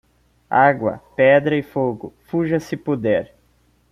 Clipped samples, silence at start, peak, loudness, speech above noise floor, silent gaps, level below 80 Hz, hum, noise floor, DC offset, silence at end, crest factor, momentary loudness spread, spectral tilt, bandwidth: under 0.1%; 0.5 s; -2 dBFS; -19 LUFS; 41 dB; none; -56 dBFS; none; -59 dBFS; under 0.1%; 0.65 s; 18 dB; 10 LU; -7.5 dB/octave; 12 kHz